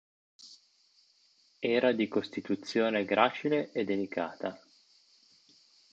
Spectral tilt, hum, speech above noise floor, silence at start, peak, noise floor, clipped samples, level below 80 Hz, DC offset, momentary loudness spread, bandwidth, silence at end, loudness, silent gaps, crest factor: -5.5 dB/octave; none; 37 dB; 0.4 s; -10 dBFS; -67 dBFS; under 0.1%; -76 dBFS; under 0.1%; 13 LU; 8.2 kHz; 1.35 s; -31 LUFS; none; 24 dB